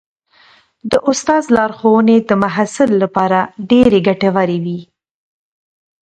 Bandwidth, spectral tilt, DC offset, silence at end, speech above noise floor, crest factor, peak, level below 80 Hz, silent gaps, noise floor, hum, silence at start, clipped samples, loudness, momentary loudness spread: 10.5 kHz; -6 dB/octave; under 0.1%; 1.2 s; 36 dB; 14 dB; 0 dBFS; -48 dBFS; none; -49 dBFS; none; 0.85 s; under 0.1%; -13 LUFS; 7 LU